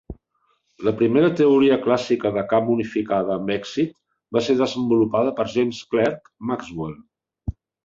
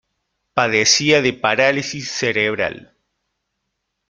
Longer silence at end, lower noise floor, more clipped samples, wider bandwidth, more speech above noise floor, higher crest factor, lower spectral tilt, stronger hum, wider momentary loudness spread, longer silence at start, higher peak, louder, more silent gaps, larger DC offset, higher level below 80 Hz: second, 0.35 s vs 1.25 s; second, -68 dBFS vs -76 dBFS; neither; second, 7.6 kHz vs 11 kHz; second, 48 dB vs 58 dB; about the same, 18 dB vs 18 dB; first, -6.5 dB/octave vs -2.5 dB/octave; neither; first, 15 LU vs 11 LU; second, 0.1 s vs 0.55 s; about the same, -4 dBFS vs -2 dBFS; second, -21 LUFS vs -17 LUFS; neither; neither; first, -48 dBFS vs -58 dBFS